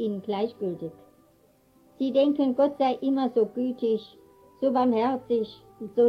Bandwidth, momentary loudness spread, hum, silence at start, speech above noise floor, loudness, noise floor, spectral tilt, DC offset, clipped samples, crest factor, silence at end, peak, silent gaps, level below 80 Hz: 6 kHz; 10 LU; none; 0 s; 36 dB; -26 LUFS; -61 dBFS; -8 dB/octave; under 0.1%; under 0.1%; 14 dB; 0 s; -12 dBFS; none; -70 dBFS